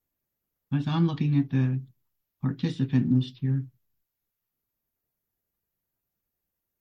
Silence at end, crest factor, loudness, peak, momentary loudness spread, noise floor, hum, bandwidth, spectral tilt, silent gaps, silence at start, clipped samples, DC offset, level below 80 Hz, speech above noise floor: 3.1 s; 18 dB; -27 LUFS; -12 dBFS; 9 LU; -83 dBFS; none; 6.4 kHz; -9 dB/octave; none; 0.7 s; under 0.1%; under 0.1%; -68 dBFS; 58 dB